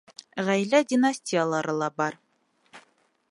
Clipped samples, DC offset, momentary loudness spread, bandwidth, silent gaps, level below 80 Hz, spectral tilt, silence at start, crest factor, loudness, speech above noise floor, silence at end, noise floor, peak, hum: under 0.1%; under 0.1%; 9 LU; 11.5 kHz; none; -78 dBFS; -5 dB/octave; 0.35 s; 18 dB; -25 LUFS; 41 dB; 0.5 s; -65 dBFS; -8 dBFS; none